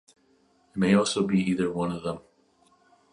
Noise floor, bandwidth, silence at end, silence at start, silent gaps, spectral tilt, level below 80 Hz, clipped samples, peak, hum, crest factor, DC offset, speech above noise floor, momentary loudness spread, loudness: -64 dBFS; 11 kHz; 0.95 s; 0.75 s; none; -5.5 dB/octave; -60 dBFS; under 0.1%; -8 dBFS; none; 20 dB; under 0.1%; 40 dB; 14 LU; -26 LUFS